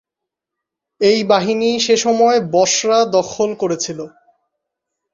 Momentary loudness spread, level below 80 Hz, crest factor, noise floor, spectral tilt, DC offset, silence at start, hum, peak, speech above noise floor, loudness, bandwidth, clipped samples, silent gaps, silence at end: 8 LU; -60 dBFS; 16 dB; -82 dBFS; -3 dB/octave; under 0.1%; 1 s; none; -2 dBFS; 67 dB; -15 LUFS; 7.6 kHz; under 0.1%; none; 1.05 s